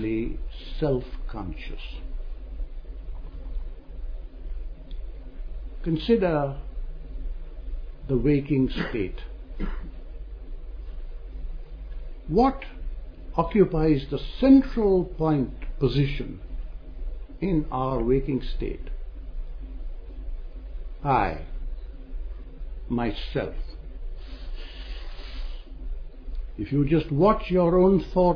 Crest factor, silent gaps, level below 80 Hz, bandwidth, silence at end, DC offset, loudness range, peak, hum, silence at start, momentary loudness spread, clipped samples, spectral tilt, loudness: 20 dB; none; -34 dBFS; 5.4 kHz; 0 s; under 0.1%; 16 LU; -6 dBFS; none; 0 s; 20 LU; under 0.1%; -9.5 dB/octave; -25 LUFS